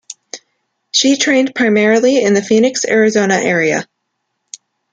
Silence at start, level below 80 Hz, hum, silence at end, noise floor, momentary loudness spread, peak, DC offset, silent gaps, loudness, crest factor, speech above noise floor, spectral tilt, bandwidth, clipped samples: 0.35 s; -60 dBFS; none; 1.1 s; -71 dBFS; 14 LU; 0 dBFS; under 0.1%; none; -12 LUFS; 14 dB; 59 dB; -3.5 dB/octave; 9.6 kHz; under 0.1%